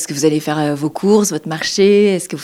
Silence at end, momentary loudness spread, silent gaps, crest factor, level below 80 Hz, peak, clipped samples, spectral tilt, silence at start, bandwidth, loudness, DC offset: 0 s; 8 LU; none; 14 dB; -60 dBFS; -2 dBFS; under 0.1%; -4.5 dB/octave; 0 s; 15.5 kHz; -15 LUFS; under 0.1%